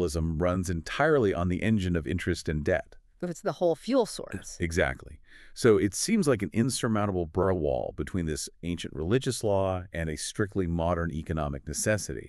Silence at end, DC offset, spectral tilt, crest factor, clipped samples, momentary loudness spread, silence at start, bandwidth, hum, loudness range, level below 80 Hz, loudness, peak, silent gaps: 0 s; under 0.1%; -5.5 dB/octave; 20 dB; under 0.1%; 9 LU; 0 s; 13.5 kHz; none; 3 LU; -44 dBFS; -28 LUFS; -8 dBFS; none